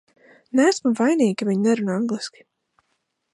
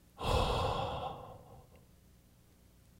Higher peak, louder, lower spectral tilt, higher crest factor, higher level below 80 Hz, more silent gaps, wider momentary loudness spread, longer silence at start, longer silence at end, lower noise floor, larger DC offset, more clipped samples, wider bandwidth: first, -6 dBFS vs -18 dBFS; first, -21 LUFS vs -35 LUFS; about the same, -5.5 dB/octave vs -5.5 dB/octave; about the same, 16 dB vs 20 dB; second, -76 dBFS vs -46 dBFS; neither; second, 8 LU vs 24 LU; first, 0.55 s vs 0.15 s; second, 1.05 s vs 1.2 s; first, -73 dBFS vs -63 dBFS; neither; neither; second, 11.5 kHz vs 16 kHz